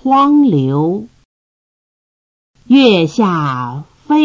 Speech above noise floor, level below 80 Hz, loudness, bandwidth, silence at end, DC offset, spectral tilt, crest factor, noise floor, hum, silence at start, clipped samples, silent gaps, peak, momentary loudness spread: over 79 dB; -56 dBFS; -12 LUFS; 7.4 kHz; 0 s; under 0.1%; -7 dB/octave; 14 dB; under -90 dBFS; none; 0.05 s; under 0.1%; 1.25-2.54 s; 0 dBFS; 14 LU